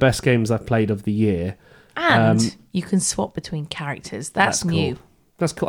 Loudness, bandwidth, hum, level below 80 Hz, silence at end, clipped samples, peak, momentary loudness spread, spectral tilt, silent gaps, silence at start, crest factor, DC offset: -21 LUFS; 17 kHz; none; -48 dBFS; 0 s; under 0.1%; -4 dBFS; 12 LU; -5 dB/octave; none; 0 s; 18 dB; under 0.1%